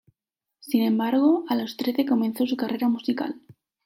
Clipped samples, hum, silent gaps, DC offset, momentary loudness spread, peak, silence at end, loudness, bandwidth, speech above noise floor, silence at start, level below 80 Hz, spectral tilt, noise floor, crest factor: under 0.1%; none; none; under 0.1%; 7 LU; -8 dBFS; 0.35 s; -24 LUFS; 16.5 kHz; 62 dB; 0.65 s; -76 dBFS; -6 dB/octave; -85 dBFS; 16 dB